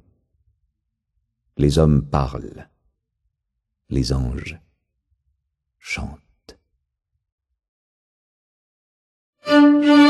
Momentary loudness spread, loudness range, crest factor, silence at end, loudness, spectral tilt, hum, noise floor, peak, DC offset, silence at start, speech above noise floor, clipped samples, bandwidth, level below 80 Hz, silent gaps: 22 LU; 14 LU; 20 dB; 0 s; -18 LUFS; -6.5 dB/octave; none; -79 dBFS; -2 dBFS; under 0.1%; 1.6 s; 58 dB; under 0.1%; 11.5 kHz; -36 dBFS; 7.32-7.38 s, 7.68-9.33 s